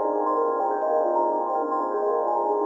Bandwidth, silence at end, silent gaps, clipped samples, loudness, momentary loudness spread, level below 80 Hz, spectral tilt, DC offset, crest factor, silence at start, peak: 7.6 kHz; 0 s; none; under 0.1%; -24 LUFS; 2 LU; under -90 dBFS; -6.5 dB/octave; under 0.1%; 12 dB; 0 s; -12 dBFS